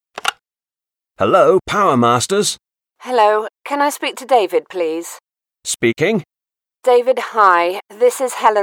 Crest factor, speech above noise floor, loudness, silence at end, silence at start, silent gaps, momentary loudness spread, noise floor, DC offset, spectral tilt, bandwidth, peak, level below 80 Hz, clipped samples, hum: 16 dB; over 75 dB; -16 LUFS; 0 s; 0.15 s; none; 11 LU; under -90 dBFS; under 0.1%; -4 dB/octave; 17 kHz; 0 dBFS; -58 dBFS; under 0.1%; none